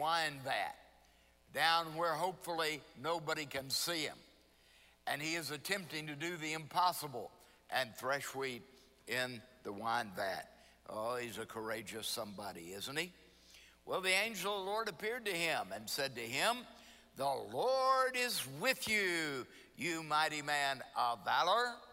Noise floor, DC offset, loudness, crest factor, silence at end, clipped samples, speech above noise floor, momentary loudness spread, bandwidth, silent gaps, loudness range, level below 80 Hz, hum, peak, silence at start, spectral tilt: -68 dBFS; under 0.1%; -37 LUFS; 20 dB; 0 s; under 0.1%; 30 dB; 13 LU; 16 kHz; none; 6 LU; -74 dBFS; none; -18 dBFS; 0 s; -2.5 dB/octave